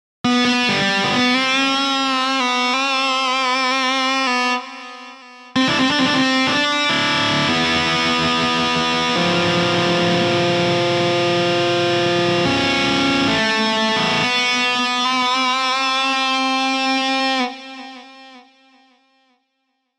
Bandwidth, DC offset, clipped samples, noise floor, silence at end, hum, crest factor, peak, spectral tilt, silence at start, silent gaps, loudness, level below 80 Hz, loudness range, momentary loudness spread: 13.5 kHz; under 0.1%; under 0.1%; -71 dBFS; 1.6 s; none; 12 dB; -6 dBFS; -3.5 dB/octave; 0.25 s; none; -17 LUFS; -52 dBFS; 2 LU; 3 LU